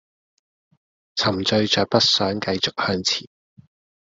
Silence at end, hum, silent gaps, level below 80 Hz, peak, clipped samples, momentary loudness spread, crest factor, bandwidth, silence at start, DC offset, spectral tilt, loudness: 0.85 s; none; none; -60 dBFS; -4 dBFS; under 0.1%; 7 LU; 20 dB; 8 kHz; 1.15 s; under 0.1%; -3.5 dB/octave; -20 LUFS